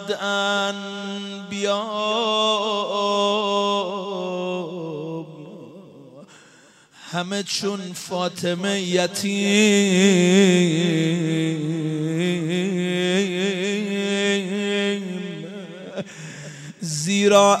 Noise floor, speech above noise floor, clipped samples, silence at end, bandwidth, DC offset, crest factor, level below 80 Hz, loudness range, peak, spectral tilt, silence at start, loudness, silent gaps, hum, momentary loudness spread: -52 dBFS; 32 dB; under 0.1%; 0 s; 14 kHz; under 0.1%; 18 dB; -70 dBFS; 11 LU; -4 dBFS; -4.5 dB/octave; 0 s; -21 LUFS; none; none; 17 LU